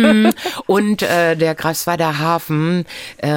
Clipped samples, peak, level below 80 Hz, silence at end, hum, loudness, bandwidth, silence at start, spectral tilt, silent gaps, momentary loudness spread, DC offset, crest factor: under 0.1%; 0 dBFS; -54 dBFS; 0 s; none; -16 LUFS; 17 kHz; 0 s; -5.5 dB/octave; none; 8 LU; under 0.1%; 16 dB